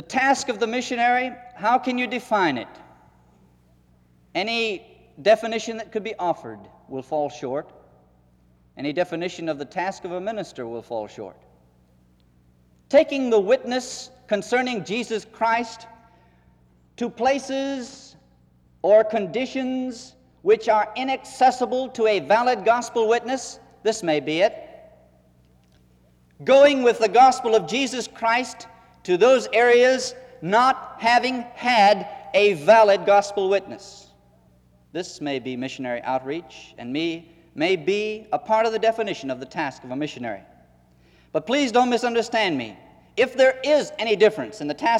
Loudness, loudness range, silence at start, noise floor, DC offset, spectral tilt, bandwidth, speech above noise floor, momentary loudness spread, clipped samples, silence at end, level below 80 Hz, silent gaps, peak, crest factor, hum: -22 LUFS; 11 LU; 0.1 s; -58 dBFS; under 0.1%; -4 dB/octave; 12.5 kHz; 37 dB; 16 LU; under 0.1%; 0 s; -64 dBFS; none; -4 dBFS; 18 dB; none